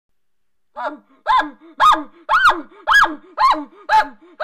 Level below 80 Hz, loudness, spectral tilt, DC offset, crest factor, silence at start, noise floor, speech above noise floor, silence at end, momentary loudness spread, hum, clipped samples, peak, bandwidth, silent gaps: -48 dBFS; -16 LUFS; -1.5 dB/octave; under 0.1%; 12 dB; 0.75 s; -79 dBFS; 62 dB; 0 s; 15 LU; none; under 0.1%; -6 dBFS; 15.5 kHz; none